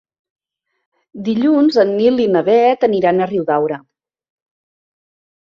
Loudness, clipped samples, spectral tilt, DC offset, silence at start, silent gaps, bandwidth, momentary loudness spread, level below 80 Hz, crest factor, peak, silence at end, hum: -14 LUFS; under 0.1%; -7.5 dB/octave; under 0.1%; 1.15 s; none; 6.8 kHz; 9 LU; -62 dBFS; 16 dB; -2 dBFS; 1.65 s; none